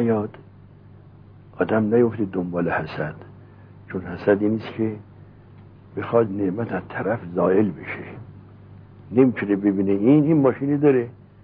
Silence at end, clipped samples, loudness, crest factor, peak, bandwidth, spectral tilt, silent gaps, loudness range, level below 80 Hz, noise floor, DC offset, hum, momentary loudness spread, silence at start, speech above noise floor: 0.3 s; under 0.1%; -22 LUFS; 18 dB; -4 dBFS; 5.2 kHz; -11.5 dB/octave; none; 6 LU; -56 dBFS; -46 dBFS; under 0.1%; none; 15 LU; 0 s; 26 dB